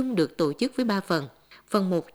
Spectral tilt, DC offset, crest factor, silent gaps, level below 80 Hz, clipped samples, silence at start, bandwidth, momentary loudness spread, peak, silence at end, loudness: -6 dB/octave; under 0.1%; 18 dB; none; -66 dBFS; under 0.1%; 0 s; over 20 kHz; 4 LU; -8 dBFS; 0.1 s; -26 LUFS